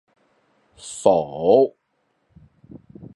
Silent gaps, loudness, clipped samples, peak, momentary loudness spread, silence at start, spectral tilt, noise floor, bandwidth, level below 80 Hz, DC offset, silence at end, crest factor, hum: none; -19 LUFS; under 0.1%; -2 dBFS; 23 LU; 0.85 s; -6 dB/octave; -70 dBFS; 11.5 kHz; -60 dBFS; under 0.1%; 0.1 s; 22 dB; none